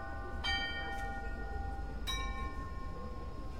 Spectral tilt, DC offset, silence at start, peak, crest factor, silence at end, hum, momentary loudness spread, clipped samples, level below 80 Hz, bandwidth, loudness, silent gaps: -4 dB/octave; 0.4%; 0 s; -22 dBFS; 16 dB; 0 s; none; 10 LU; under 0.1%; -42 dBFS; 16 kHz; -40 LUFS; none